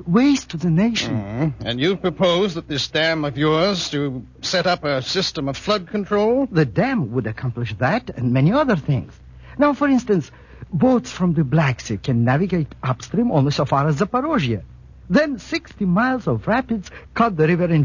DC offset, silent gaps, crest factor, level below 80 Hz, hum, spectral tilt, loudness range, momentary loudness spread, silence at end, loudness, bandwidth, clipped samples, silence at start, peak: under 0.1%; none; 16 dB; -44 dBFS; none; -6 dB/octave; 1 LU; 8 LU; 0 s; -20 LUFS; 7.4 kHz; under 0.1%; 0 s; -4 dBFS